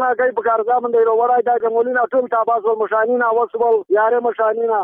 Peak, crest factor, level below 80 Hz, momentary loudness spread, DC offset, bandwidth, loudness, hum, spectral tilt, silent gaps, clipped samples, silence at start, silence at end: -8 dBFS; 8 dB; -66 dBFS; 2 LU; under 0.1%; 3.6 kHz; -17 LUFS; none; -8 dB/octave; none; under 0.1%; 0 s; 0 s